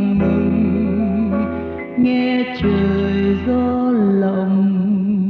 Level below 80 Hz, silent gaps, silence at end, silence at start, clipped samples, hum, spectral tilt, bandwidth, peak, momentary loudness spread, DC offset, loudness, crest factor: -38 dBFS; none; 0 s; 0 s; under 0.1%; none; -10 dB/octave; 5 kHz; -6 dBFS; 3 LU; under 0.1%; -17 LUFS; 12 dB